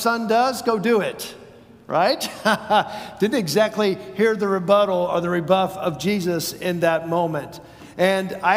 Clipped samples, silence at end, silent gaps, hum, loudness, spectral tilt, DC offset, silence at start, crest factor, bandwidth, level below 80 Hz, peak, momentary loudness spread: under 0.1%; 0 s; none; none; -21 LUFS; -5 dB/octave; under 0.1%; 0 s; 18 dB; 16 kHz; -60 dBFS; -4 dBFS; 8 LU